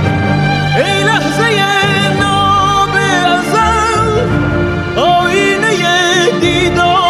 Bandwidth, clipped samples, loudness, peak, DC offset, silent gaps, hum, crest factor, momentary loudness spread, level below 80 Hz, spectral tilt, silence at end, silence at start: 14.5 kHz; under 0.1%; -11 LUFS; 0 dBFS; under 0.1%; none; none; 10 dB; 3 LU; -32 dBFS; -4.5 dB/octave; 0 s; 0 s